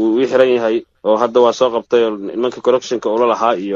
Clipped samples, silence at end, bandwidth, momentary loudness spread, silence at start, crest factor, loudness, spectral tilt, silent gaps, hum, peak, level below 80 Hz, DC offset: under 0.1%; 0 s; 7.4 kHz; 6 LU; 0 s; 14 dB; -15 LUFS; -5 dB/octave; none; none; 0 dBFS; -60 dBFS; under 0.1%